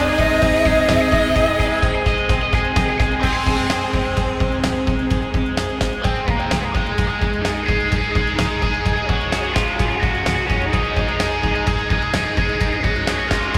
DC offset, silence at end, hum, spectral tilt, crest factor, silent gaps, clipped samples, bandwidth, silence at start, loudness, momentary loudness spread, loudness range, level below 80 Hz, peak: 0.7%; 0 s; none; -5.5 dB/octave; 14 dB; none; under 0.1%; 14 kHz; 0 s; -19 LUFS; 5 LU; 3 LU; -24 dBFS; -4 dBFS